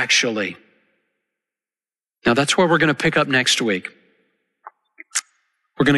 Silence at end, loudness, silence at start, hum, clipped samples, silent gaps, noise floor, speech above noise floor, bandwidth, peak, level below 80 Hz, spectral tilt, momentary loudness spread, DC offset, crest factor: 0 s; -18 LUFS; 0 s; none; under 0.1%; none; under -90 dBFS; over 72 dB; 12 kHz; -6 dBFS; -56 dBFS; -3.5 dB/octave; 10 LU; under 0.1%; 16 dB